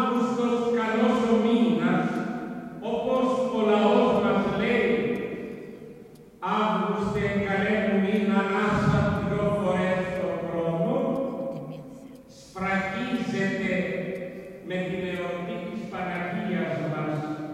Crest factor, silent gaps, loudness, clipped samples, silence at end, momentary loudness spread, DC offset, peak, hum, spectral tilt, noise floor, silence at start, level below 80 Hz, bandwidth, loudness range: 18 dB; none; -26 LUFS; under 0.1%; 0 s; 13 LU; under 0.1%; -8 dBFS; none; -7 dB/octave; -47 dBFS; 0 s; -54 dBFS; 11 kHz; 6 LU